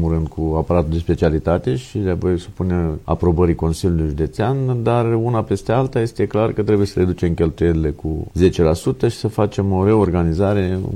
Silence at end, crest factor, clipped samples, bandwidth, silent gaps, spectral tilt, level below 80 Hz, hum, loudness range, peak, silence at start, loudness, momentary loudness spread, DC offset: 0 s; 16 dB; under 0.1%; 13 kHz; none; -8 dB/octave; -34 dBFS; none; 2 LU; -2 dBFS; 0 s; -18 LUFS; 6 LU; under 0.1%